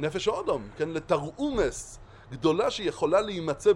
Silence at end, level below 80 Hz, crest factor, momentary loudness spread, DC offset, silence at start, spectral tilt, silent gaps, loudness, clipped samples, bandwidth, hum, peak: 0 s; -48 dBFS; 16 dB; 12 LU; under 0.1%; 0 s; -5 dB/octave; none; -28 LUFS; under 0.1%; 12 kHz; none; -10 dBFS